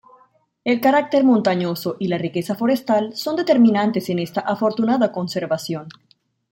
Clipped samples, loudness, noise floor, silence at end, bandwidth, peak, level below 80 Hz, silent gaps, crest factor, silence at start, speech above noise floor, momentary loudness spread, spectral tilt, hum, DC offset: under 0.1%; -19 LUFS; -58 dBFS; 0.6 s; 17 kHz; -4 dBFS; -66 dBFS; none; 16 dB; 0.65 s; 39 dB; 9 LU; -6.5 dB/octave; none; under 0.1%